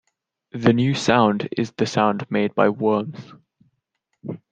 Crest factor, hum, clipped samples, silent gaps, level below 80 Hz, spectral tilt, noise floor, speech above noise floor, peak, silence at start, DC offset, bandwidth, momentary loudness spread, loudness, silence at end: 20 dB; none; under 0.1%; none; -60 dBFS; -6 dB/octave; -75 dBFS; 54 dB; -2 dBFS; 0.55 s; under 0.1%; 9.2 kHz; 18 LU; -20 LUFS; 0.15 s